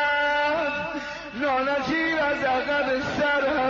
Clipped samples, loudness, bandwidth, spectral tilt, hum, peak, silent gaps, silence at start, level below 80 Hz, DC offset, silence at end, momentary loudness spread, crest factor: under 0.1%; -24 LUFS; 7.6 kHz; -4.5 dB/octave; none; -14 dBFS; none; 0 s; -52 dBFS; under 0.1%; 0 s; 7 LU; 10 dB